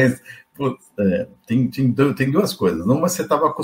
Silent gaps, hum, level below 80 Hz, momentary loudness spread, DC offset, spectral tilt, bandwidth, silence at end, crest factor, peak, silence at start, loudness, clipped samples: none; none; -54 dBFS; 8 LU; under 0.1%; -6 dB/octave; 16 kHz; 0 s; 18 dB; -2 dBFS; 0 s; -20 LUFS; under 0.1%